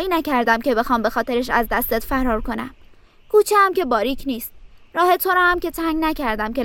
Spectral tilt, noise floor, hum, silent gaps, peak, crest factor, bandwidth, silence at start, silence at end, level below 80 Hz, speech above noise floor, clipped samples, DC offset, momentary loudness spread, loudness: -4 dB/octave; -47 dBFS; none; none; -2 dBFS; 18 dB; 17 kHz; 0 s; 0 s; -38 dBFS; 28 dB; under 0.1%; under 0.1%; 12 LU; -19 LUFS